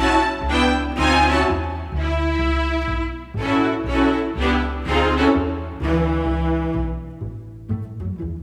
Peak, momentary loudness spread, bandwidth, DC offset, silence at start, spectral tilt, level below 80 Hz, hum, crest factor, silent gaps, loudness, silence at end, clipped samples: -4 dBFS; 12 LU; 11 kHz; under 0.1%; 0 s; -6 dB/octave; -26 dBFS; none; 16 dB; none; -21 LUFS; 0 s; under 0.1%